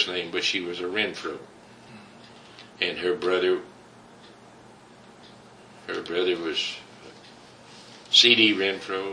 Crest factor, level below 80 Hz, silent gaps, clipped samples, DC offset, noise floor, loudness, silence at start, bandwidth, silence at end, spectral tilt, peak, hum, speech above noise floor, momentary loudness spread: 26 dB; -70 dBFS; none; under 0.1%; under 0.1%; -50 dBFS; -23 LUFS; 0 s; 10.5 kHz; 0 s; -2.5 dB/octave; -2 dBFS; none; 25 dB; 20 LU